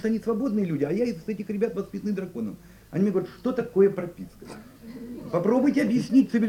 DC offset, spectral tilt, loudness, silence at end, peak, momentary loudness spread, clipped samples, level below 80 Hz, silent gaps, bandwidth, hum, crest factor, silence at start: under 0.1%; -8 dB/octave; -26 LUFS; 0 s; -10 dBFS; 20 LU; under 0.1%; -58 dBFS; none; 16.5 kHz; none; 16 dB; 0 s